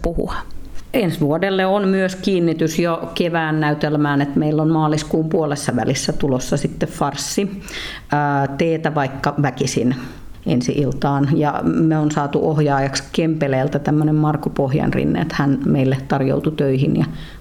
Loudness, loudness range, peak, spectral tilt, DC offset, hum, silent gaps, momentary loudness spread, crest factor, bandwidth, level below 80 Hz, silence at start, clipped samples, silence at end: -19 LUFS; 3 LU; -4 dBFS; -6 dB/octave; under 0.1%; none; none; 5 LU; 14 dB; 15.5 kHz; -38 dBFS; 0 s; under 0.1%; 0 s